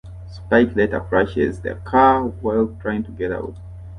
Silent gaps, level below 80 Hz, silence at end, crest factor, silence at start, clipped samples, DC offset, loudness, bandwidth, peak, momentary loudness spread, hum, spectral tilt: none; -38 dBFS; 0 s; 18 dB; 0.05 s; under 0.1%; under 0.1%; -19 LUFS; 10 kHz; -2 dBFS; 16 LU; none; -8 dB/octave